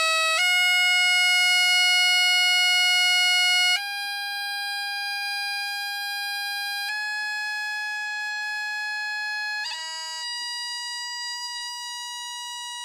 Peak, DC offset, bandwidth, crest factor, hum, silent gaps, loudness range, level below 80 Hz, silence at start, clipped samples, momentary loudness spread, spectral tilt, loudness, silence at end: -12 dBFS; under 0.1%; 18.5 kHz; 14 dB; none; none; 11 LU; -80 dBFS; 0 s; under 0.1%; 13 LU; 6.5 dB/octave; -22 LUFS; 0 s